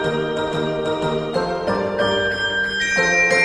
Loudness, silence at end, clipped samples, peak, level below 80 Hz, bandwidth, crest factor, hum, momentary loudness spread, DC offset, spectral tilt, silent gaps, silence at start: -20 LUFS; 0 s; under 0.1%; -4 dBFS; -46 dBFS; 12 kHz; 16 dB; none; 7 LU; under 0.1%; -3.5 dB/octave; none; 0 s